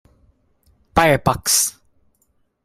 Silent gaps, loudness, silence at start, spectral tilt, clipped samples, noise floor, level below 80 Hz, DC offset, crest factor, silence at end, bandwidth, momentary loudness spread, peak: none; -17 LUFS; 0.95 s; -3 dB/octave; under 0.1%; -65 dBFS; -42 dBFS; under 0.1%; 20 dB; 0.95 s; 16 kHz; 6 LU; 0 dBFS